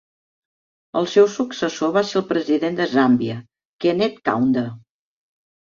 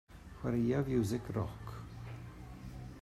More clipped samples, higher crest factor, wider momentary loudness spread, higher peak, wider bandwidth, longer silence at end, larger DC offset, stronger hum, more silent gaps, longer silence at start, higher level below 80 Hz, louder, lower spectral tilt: neither; about the same, 18 dB vs 16 dB; second, 8 LU vs 17 LU; first, -2 dBFS vs -22 dBFS; second, 7.4 kHz vs 14.5 kHz; first, 0.95 s vs 0 s; neither; neither; first, 3.67-3.79 s vs none; first, 0.95 s vs 0.1 s; second, -62 dBFS vs -54 dBFS; first, -20 LUFS vs -37 LUFS; second, -5.5 dB/octave vs -7.5 dB/octave